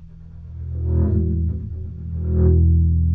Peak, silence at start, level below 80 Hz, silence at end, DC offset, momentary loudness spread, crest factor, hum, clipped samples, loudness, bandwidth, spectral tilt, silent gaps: -4 dBFS; 0 s; -24 dBFS; 0 s; under 0.1%; 16 LU; 14 dB; none; under 0.1%; -20 LUFS; 1.6 kHz; -14.5 dB/octave; none